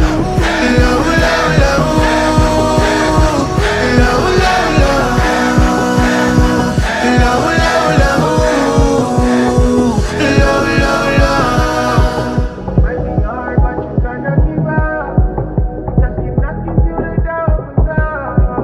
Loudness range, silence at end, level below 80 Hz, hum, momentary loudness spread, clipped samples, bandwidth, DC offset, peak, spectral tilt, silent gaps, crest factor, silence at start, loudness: 4 LU; 0 s; -18 dBFS; none; 6 LU; under 0.1%; 14 kHz; under 0.1%; 0 dBFS; -6 dB/octave; none; 12 dB; 0 s; -13 LUFS